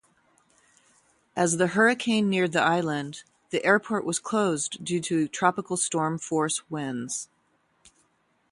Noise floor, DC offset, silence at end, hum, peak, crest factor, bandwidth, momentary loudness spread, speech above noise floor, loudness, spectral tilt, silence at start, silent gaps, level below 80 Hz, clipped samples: -69 dBFS; under 0.1%; 1.25 s; none; -6 dBFS; 20 dB; 11.5 kHz; 11 LU; 43 dB; -26 LUFS; -4 dB/octave; 1.35 s; none; -70 dBFS; under 0.1%